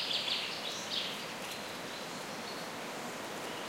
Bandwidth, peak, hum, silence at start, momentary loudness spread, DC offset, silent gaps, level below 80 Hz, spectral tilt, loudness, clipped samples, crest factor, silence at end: 16 kHz; -22 dBFS; none; 0 s; 8 LU; under 0.1%; none; -76 dBFS; -1.5 dB/octave; -37 LUFS; under 0.1%; 18 dB; 0 s